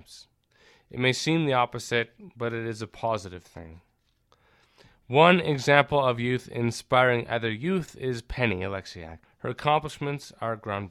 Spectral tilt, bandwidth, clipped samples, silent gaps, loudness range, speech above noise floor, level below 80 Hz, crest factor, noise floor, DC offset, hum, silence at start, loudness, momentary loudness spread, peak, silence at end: -5.5 dB/octave; 14 kHz; under 0.1%; none; 7 LU; 41 dB; -54 dBFS; 24 dB; -67 dBFS; under 0.1%; none; 0.1 s; -26 LUFS; 16 LU; -2 dBFS; 0 s